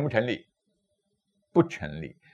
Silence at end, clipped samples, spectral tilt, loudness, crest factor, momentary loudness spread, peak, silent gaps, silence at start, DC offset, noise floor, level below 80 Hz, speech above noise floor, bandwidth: 0.2 s; under 0.1%; -7.5 dB/octave; -28 LUFS; 22 dB; 12 LU; -8 dBFS; none; 0 s; under 0.1%; -77 dBFS; -62 dBFS; 49 dB; 7.6 kHz